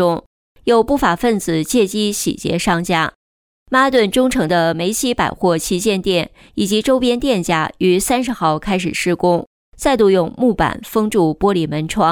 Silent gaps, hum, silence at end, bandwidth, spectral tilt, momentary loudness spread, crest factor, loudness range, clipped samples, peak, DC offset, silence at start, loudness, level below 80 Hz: 0.26-0.55 s, 3.15-3.66 s, 9.47-9.72 s; none; 0 s; 19.5 kHz; -4.5 dB/octave; 5 LU; 14 dB; 1 LU; under 0.1%; -2 dBFS; under 0.1%; 0 s; -16 LUFS; -40 dBFS